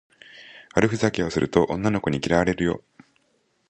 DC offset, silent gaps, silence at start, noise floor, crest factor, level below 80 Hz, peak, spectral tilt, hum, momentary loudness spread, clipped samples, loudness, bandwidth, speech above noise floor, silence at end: under 0.1%; none; 0.35 s; -68 dBFS; 22 dB; -46 dBFS; -4 dBFS; -6 dB/octave; none; 10 LU; under 0.1%; -23 LUFS; 9.4 kHz; 45 dB; 0.9 s